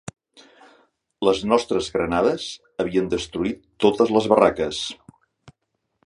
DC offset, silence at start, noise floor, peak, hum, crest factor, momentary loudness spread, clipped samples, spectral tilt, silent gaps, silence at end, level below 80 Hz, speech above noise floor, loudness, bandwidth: under 0.1%; 1.2 s; -76 dBFS; -2 dBFS; none; 22 dB; 12 LU; under 0.1%; -5 dB/octave; none; 0.55 s; -50 dBFS; 55 dB; -22 LUFS; 11.5 kHz